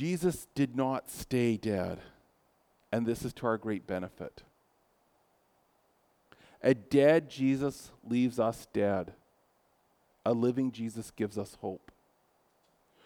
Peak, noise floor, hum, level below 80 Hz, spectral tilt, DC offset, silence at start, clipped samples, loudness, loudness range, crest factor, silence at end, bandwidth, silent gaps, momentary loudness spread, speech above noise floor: -12 dBFS; -71 dBFS; none; -64 dBFS; -6.5 dB/octave; under 0.1%; 0 s; under 0.1%; -32 LUFS; 8 LU; 20 dB; 1.3 s; 19 kHz; none; 14 LU; 40 dB